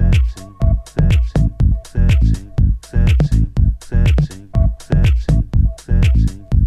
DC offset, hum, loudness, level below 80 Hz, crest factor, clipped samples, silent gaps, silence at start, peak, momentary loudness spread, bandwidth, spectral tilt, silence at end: under 0.1%; none; -17 LUFS; -16 dBFS; 12 dB; under 0.1%; none; 0 s; -2 dBFS; 4 LU; 11 kHz; -7.5 dB/octave; 0 s